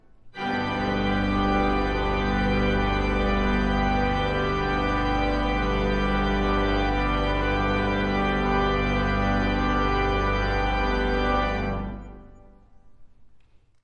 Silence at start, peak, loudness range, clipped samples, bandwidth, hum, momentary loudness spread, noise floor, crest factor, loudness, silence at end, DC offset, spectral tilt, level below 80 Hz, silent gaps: 0.25 s; -10 dBFS; 2 LU; under 0.1%; 6.6 kHz; none; 3 LU; -53 dBFS; 14 dB; -24 LUFS; 0.45 s; under 0.1%; -7 dB/octave; -30 dBFS; none